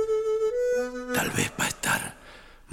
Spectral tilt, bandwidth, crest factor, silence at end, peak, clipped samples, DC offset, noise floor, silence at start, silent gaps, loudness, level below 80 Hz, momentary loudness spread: -3 dB/octave; 18.5 kHz; 16 dB; 0 s; -10 dBFS; under 0.1%; under 0.1%; -49 dBFS; 0 s; none; -27 LUFS; -52 dBFS; 4 LU